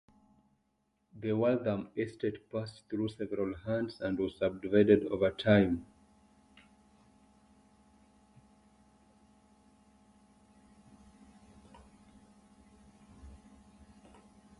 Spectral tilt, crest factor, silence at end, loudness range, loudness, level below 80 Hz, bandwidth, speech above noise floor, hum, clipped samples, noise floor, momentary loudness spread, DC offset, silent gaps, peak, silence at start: -8 dB/octave; 24 dB; 1.25 s; 6 LU; -32 LUFS; -62 dBFS; 11 kHz; 47 dB; none; under 0.1%; -77 dBFS; 14 LU; under 0.1%; none; -12 dBFS; 1.15 s